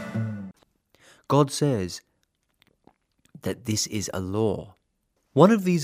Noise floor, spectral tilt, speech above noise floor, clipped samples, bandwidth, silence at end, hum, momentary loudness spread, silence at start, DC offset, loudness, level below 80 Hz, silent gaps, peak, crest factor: -73 dBFS; -5.5 dB/octave; 50 dB; under 0.1%; 16 kHz; 0 s; none; 17 LU; 0 s; under 0.1%; -25 LUFS; -64 dBFS; none; -2 dBFS; 24 dB